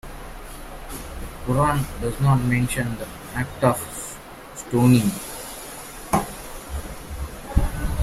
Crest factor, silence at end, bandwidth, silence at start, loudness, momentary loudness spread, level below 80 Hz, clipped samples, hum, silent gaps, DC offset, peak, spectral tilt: 20 dB; 0 s; 16 kHz; 0.05 s; -24 LUFS; 18 LU; -34 dBFS; under 0.1%; none; none; under 0.1%; -2 dBFS; -6 dB/octave